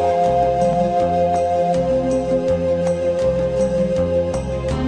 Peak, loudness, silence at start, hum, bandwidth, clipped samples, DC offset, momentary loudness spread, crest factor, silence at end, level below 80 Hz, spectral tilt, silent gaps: -6 dBFS; -18 LUFS; 0 s; none; 9.6 kHz; under 0.1%; 0.1%; 3 LU; 12 dB; 0 s; -34 dBFS; -7 dB/octave; none